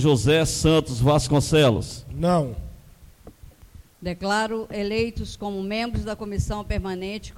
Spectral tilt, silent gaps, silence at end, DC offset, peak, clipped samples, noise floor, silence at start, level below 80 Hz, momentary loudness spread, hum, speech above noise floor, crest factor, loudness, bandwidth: -5.5 dB/octave; none; 0 s; under 0.1%; -8 dBFS; under 0.1%; -48 dBFS; 0 s; -38 dBFS; 13 LU; none; 26 dB; 16 dB; -23 LUFS; 16 kHz